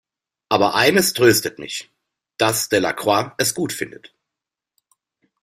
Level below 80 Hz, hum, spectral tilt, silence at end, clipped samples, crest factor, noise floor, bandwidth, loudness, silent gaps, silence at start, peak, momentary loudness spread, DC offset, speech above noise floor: -58 dBFS; none; -3 dB/octave; 1.55 s; under 0.1%; 20 dB; -86 dBFS; 16 kHz; -18 LUFS; none; 0.5 s; -2 dBFS; 14 LU; under 0.1%; 67 dB